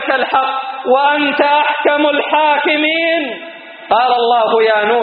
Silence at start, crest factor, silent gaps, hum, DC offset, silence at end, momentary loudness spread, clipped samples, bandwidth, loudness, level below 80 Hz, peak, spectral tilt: 0 s; 14 dB; none; none; under 0.1%; 0 s; 7 LU; under 0.1%; 4.8 kHz; -13 LUFS; -64 dBFS; 0 dBFS; 1 dB/octave